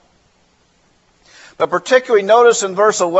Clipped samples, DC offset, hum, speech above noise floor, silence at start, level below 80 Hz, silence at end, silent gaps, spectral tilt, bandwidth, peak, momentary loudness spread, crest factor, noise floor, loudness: under 0.1%; under 0.1%; none; 44 dB; 1.6 s; -64 dBFS; 0 s; none; -2.5 dB/octave; 8.2 kHz; 0 dBFS; 9 LU; 16 dB; -57 dBFS; -13 LUFS